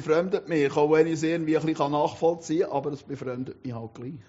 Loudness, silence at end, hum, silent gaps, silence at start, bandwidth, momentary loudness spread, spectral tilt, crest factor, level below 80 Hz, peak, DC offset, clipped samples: -26 LUFS; 0.1 s; none; none; 0 s; 8 kHz; 14 LU; -6 dB/octave; 18 dB; -66 dBFS; -8 dBFS; under 0.1%; under 0.1%